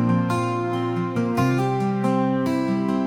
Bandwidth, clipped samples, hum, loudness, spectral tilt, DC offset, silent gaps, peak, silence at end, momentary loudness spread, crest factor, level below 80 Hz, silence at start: 15 kHz; under 0.1%; none; -22 LUFS; -7.5 dB/octave; under 0.1%; none; -8 dBFS; 0 s; 3 LU; 14 dB; -60 dBFS; 0 s